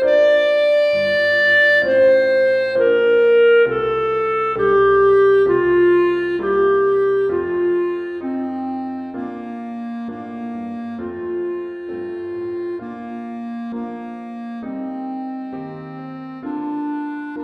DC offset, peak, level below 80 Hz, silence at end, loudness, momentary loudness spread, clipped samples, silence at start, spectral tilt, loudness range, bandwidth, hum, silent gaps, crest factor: under 0.1%; -6 dBFS; -52 dBFS; 0 s; -17 LUFS; 16 LU; under 0.1%; 0 s; -6.5 dB/octave; 14 LU; 6.8 kHz; none; none; 12 dB